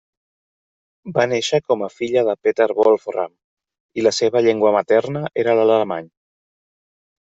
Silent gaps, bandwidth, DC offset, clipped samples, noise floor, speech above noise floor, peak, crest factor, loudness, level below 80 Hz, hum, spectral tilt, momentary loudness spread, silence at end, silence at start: 3.44-3.57 s, 3.80-3.89 s; 8 kHz; under 0.1%; under 0.1%; under -90 dBFS; over 73 dB; -2 dBFS; 16 dB; -18 LUFS; -64 dBFS; none; -5 dB/octave; 10 LU; 1.25 s; 1.05 s